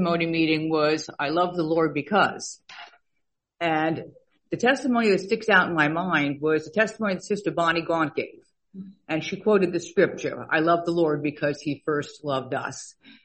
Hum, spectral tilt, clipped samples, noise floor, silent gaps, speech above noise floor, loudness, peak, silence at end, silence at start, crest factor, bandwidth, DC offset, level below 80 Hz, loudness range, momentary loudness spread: none; -5 dB/octave; under 0.1%; -78 dBFS; none; 54 dB; -24 LUFS; -4 dBFS; 0.15 s; 0 s; 20 dB; 8.4 kHz; under 0.1%; -64 dBFS; 3 LU; 13 LU